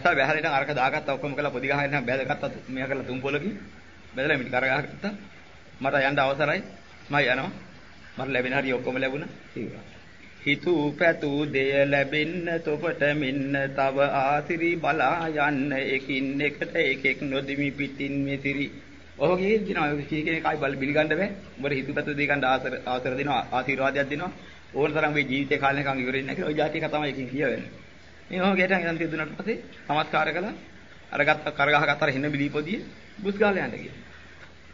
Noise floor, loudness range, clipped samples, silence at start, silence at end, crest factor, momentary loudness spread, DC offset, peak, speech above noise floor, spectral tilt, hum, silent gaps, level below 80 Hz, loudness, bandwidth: -49 dBFS; 3 LU; under 0.1%; 0 s; 0 s; 22 dB; 11 LU; 0.3%; -6 dBFS; 23 dB; -6.5 dB/octave; none; none; -58 dBFS; -26 LUFS; 7.6 kHz